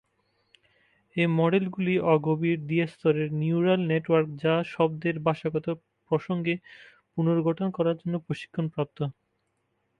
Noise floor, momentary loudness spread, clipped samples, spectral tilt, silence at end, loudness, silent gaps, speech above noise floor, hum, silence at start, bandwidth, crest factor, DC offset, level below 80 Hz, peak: -75 dBFS; 9 LU; under 0.1%; -9 dB/octave; 0.9 s; -27 LUFS; none; 49 dB; none; 1.15 s; 5.8 kHz; 20 dB; under 0.1%; -68 dBFS; -8 dBFS